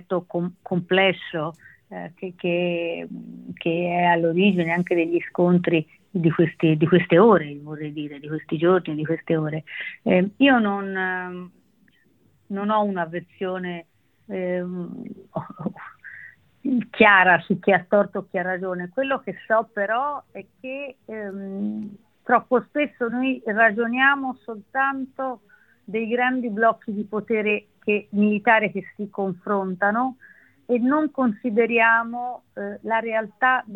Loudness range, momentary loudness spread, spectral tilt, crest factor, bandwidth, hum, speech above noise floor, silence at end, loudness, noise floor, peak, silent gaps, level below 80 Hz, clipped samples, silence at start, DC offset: 8 LU; 16 LU; -9 dB/octave; 22 dB; 4.2 kHz; none; 39 dB; 0 s; -22 LUFS; -61 dBFS; -2 dBFS; none; -66 dBFS; under 0.1%; 0.1 s; under 0.1%